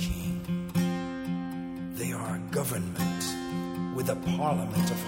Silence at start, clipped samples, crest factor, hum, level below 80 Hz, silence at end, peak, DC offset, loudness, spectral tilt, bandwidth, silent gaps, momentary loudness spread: 0 s; under 0.1%; 16 dB; none; -48 dBFS; 0 s; -14 dBFS; under 0.1%; -31 LUFS; -5.5 dB/octave; 16.5 kHz; none; 6 LU